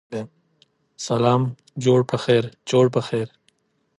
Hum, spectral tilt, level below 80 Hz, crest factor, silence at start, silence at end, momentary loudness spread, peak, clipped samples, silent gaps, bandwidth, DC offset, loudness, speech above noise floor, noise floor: none; -6.5 dB/octave; -62 dBFS; 18 dB; 0.1 s; 0.7 s; 15 LU; -6 dBFS; under 0.1%; none; 11.5 kHz; under 0.1%; -21 LUFS; 45 dB; -65 dBFS